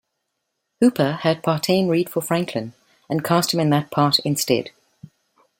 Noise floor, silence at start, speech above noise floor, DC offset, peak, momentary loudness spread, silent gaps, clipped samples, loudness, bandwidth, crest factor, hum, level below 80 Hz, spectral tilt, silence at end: -77 dBFS; 0.8 s; 57 dB; under 0.1%; -4 dBFS; 9 LU; none; under 0.1%; -20 LUFS; 17 kHz; 18 dB; none; -62 dBFS; -5 dB/octave; 0.9 s